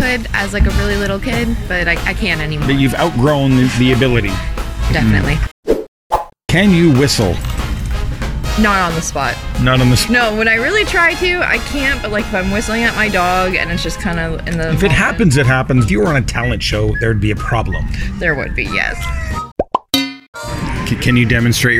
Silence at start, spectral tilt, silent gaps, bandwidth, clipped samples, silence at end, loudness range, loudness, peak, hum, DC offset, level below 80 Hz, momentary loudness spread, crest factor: 0 s; -5 dB/octave; 5.51-5.63 s, 5.88-6.10 s, 19.52-19.56 s, 20.28-20.33 s; 16.5 kHz; under 0.1%; 0 s; 4 LU; -15 LUFS; 0 dBFS; none; under 0.1%; -24 dBFS; 9 LU; 14 dB